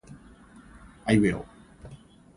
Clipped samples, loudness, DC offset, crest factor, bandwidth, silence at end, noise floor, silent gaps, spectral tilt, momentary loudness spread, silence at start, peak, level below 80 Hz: under 0.1%; -26 LUFS; under 0.1%; 22 dB; 11 kHz; 0.4 s; -51 dBFS; none; -6.5 dB/octave; 26 LU; 0.1 s; -10 dBFS; -50 dBFS